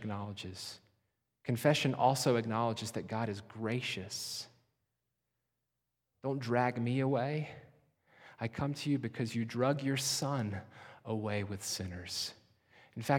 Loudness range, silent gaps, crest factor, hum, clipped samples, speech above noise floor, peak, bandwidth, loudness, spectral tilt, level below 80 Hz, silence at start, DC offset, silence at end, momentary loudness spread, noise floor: 6 LU; none; 22 dB; 60 Hz at -60 dBFS; under 0.1%; 52 dB; -14 dBFS; 18 kHz; -35 LUFS; -5 dB/octave; -70 dBFS; 0 s; under 0.1%; 0 s; 15 LU; -87 dBFS